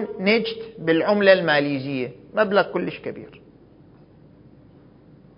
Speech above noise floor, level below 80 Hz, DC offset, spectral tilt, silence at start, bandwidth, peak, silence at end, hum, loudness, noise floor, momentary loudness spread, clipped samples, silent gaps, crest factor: 29 dB; -62 dBFS; under 0.1%; -10 dB/octave; 0 s; 5.4 kHz; -2 dBFS; 2 s; none; -21 LUFS; -50 dBFS; 14 LU; under 0.1%; none; 20 dB